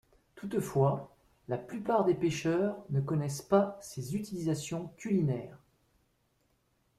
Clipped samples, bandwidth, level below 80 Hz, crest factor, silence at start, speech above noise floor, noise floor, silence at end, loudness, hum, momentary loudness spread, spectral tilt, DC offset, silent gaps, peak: under 0.1%; 14.5 kHz; -66 dBFS; 20 dB; 0.35 s; 42 dB; -74 dBFS; 1.4 s; -32 LUFS; none; 10 LU; -7 dB/octave; under 0.1%; none; -14 dBFS